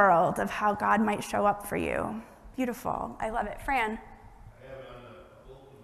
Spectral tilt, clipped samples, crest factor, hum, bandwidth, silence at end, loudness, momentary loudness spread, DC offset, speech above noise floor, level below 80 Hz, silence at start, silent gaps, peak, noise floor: -5.5 dB/octave; under 0.1%; 22 dB; none; 13.5 kHz; 0 s; -29 LUFS; 20 LU; under 0.1%; 23 dB; -50 dBFS; 0 s; none; -8 dBFS; -51 dBFS